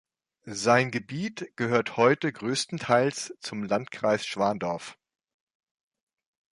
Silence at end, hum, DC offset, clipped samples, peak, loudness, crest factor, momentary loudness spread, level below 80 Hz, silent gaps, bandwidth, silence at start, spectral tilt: 1.65 s; none; under 0.1%; under 0.1%; -6 dBFS; -27 LUFS; 22 dB; 12 LU; -68 dBFS; none; 11.5 kHz; 0.45 s; -4.5 dB/octave